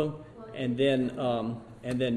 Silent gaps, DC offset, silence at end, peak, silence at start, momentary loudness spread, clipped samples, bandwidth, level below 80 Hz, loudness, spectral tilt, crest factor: none; under 0.1%; 0 s; -14 dBFS; 0 s; 14 LU; under 0.1%; 11.5 kHz; -60 dBFS; -30 LUFS; -7 dB/octave; 16 dB